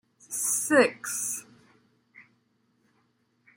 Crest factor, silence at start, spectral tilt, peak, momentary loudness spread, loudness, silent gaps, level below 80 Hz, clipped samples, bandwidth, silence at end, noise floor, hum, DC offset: 22 dB; 0.3 s; -2 dB/octave; -8 dBFS; 13 LU; -26 LUFS; none; -80 dBFS; under 0.1%; 16.5 kHz; 1.35 s; -70 dBFS; none; under 0.1%